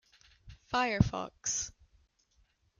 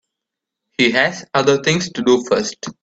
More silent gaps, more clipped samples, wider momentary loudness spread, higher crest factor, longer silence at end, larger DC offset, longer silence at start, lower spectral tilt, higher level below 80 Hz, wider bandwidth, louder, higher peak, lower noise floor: neither; neither; about the same, 7 LU vs 5 LU; first, 26 dB vs 18 dB; first, 1.1 s vs 0.1 s; neither; second, 0.45 s vs 0.8 s; about the same, -4 dB/octave vs -4 dB/octave; first, -50 dBFS vs -56 dBFS; first, 10 kHz vs 8.8 kHz; second, -33 LUFS vs -17 LUFS; second, -10 dBFS vs 0 dBFS; second, -71 dBFS vs -82 dBFS